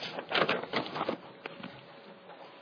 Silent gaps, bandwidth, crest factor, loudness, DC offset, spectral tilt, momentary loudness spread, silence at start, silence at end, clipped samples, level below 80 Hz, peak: none; 5.4 kHz; 26 dB; -33 LUFS; under 0.1%; -5 dB/octave; 21 LU; 0 s; 0 s; under 0.1%; -78 dBFS; -12 dBFS